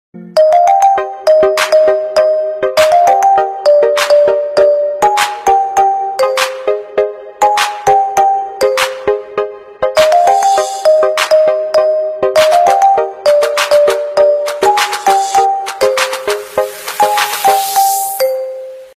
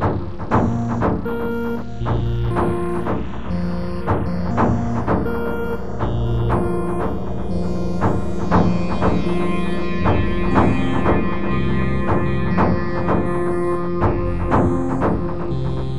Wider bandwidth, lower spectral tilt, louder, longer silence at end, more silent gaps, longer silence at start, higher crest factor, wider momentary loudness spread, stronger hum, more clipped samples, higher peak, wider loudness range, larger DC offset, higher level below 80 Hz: first, 15.5 kHz vs 12 kHz; second, -1.5 dB/octave vs -8.5 dB/octave; first, -11 LUFS vs -21 LUFS; first, 0.15 s vs 0 s; neither; first, 0.15 s vs 0 s; second, 10 dB vs 18 dB; about the same, 8 LU vs 6 LU; neither; neither; about the same, 0 dBFS vs 0 dBFS; about the same, 3 LU vs 3 LU; second, under 0.1% vs 5%; second, -50 dBFS vs -30 dBFS